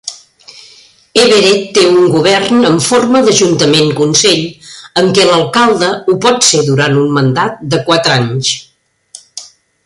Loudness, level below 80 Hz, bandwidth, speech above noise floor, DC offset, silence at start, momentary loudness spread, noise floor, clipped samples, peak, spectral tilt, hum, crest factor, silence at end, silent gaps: -9 LUFS; -50 dBFS; 11.5 kHz; 33 dB; under 0.1%; 0.05 s; 9 LU; -42 dBFS; under 0.1%; 0 dBFS; -4 dB/octave; none; 10 dB; 0.4 s; none